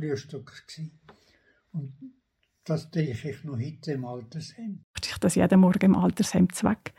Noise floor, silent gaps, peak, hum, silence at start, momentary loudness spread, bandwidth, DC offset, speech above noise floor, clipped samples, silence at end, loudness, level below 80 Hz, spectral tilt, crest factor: -64 dBFS; 4.84-4.94 s; -10 dBFS; none; 0 s; 21 LU; 12.5 kHz; under 0.1%; 38 dB; under 0.1%; 0.1 s; -26 LUFS; -56 dBFS; -6.5 dB/octave; 18 dB